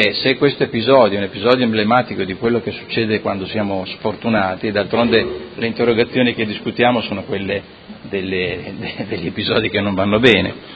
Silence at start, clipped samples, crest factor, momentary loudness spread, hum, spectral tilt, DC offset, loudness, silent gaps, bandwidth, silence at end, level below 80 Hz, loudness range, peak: 0 s; under 0.1%; 18 dB; 11 LU; none; -7 dB/octave; under 0.1%; -17 LUFS; none; 8 kHz; 0 s; -46 dBFS; 4 LU; 0 dBFS